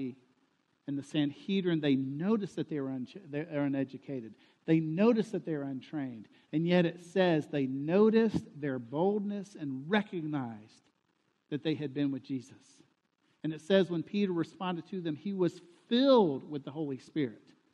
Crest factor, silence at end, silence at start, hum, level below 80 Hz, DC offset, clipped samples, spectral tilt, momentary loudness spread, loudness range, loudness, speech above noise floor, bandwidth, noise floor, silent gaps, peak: 20 dB; 0.4 s; 0 s; none; -72 dBFS; under 0.1%; under 0.1%; -7.5 dB/octave; 14 LU; 6 LU; -32 LUFS; 45 dB; 10 kHz; -76 dBFS; none; -14 dBFS